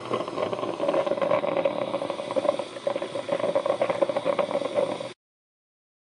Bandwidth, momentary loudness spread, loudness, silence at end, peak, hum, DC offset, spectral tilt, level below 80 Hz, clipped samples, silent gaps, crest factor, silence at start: 11 kHz; 6 LU; -27 LUFS; 1 s; -8 dBFS; none; under 0.1%; -5.5 dB/octave; -76 dBFS; under 0.1%; none; 20 dB; 0 s